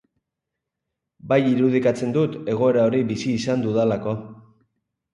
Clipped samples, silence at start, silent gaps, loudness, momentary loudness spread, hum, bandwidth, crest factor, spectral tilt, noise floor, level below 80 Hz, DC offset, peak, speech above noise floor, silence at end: under 0.1%; 1.25 s; none; -21 LUFS; 6 LU; none; 11 kHz; 18 dB; -7 dB/octave; -83 dBFS; -60 dBFS; under 0.1%; -6 dBFS; 63 dB; 0.75 s